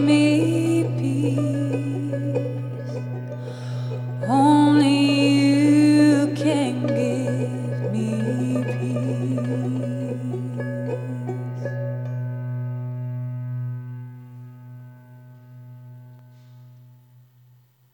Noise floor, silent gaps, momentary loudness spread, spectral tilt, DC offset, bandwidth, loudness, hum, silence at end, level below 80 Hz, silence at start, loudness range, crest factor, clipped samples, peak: -55 dBFS; none; 16 LU; -7 dB/octave; under 0.1%; 11.5 kHz; -22 LUFS; none; 1.2 s; -74 dBFS; 0 s; 15 LU; 16 dB; under 0.1%; -6 dBFS